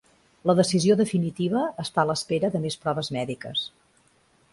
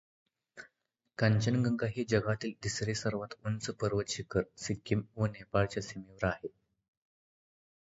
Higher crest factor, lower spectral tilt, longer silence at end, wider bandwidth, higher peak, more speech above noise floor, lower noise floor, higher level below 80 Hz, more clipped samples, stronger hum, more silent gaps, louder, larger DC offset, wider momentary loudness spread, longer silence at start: about the same, 18 dB vs 22 dB; about the same, -5.5 dB/octave vs -5.5 dB/octave; second, 0.85 s vs 1.35 s; first, 11.5 kHz vs 8 kHz; first, -8 dBFS vs -14 dBFS; second, 38 dB vs 48 dB; second, -63 dBFS vs -81 dBFS; second, -62 dBFS vs -56 dBFS; neither; neither; neither; first, -25 LUFS vs -34 LUFS; neither; second, 9 LU vs 12 LU; about the same, 0.45 s vs 0.55 s